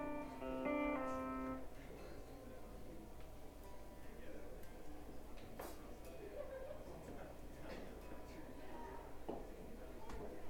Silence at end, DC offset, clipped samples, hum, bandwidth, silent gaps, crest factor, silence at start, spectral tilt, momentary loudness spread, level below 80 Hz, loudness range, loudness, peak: 0 s; under 0.1%; under 0.1%; none; 19 kHz; none; 18 dB; 0 s; -6 dB/octave; 13 LU; -58 dBFS; 10 LU; -51 LUFS; -30 dBFS